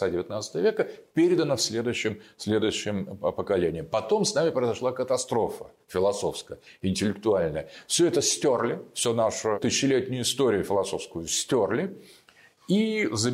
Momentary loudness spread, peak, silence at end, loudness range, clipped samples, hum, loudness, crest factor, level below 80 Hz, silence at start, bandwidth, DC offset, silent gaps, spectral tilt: 9 LU; -14 dBFS; 0 s; 2 LU; under 0.1%; none; -26 LUFS; 14 dB; -60 dBFS; 0 s; 16 kHz; under 0.1%; none; -4 dB/octave